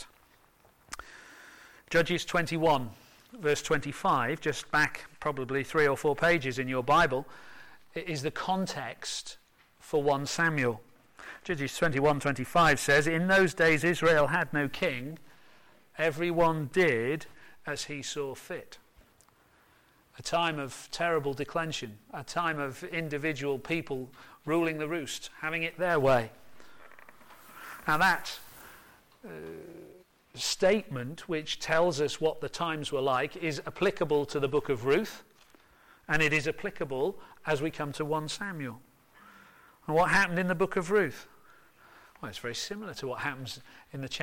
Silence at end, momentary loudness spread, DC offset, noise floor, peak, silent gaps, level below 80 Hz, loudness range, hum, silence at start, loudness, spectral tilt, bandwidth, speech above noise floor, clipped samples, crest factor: 0 s; 19 LU; under 0.1%; -64 dBFS; -14 dBFS; none; -56 dBFS; 7 LU; none; 0 s; -29 LUFS; -4.5 dB/octave; 17 kHz; 34 dB; under 0.1%; 16 dB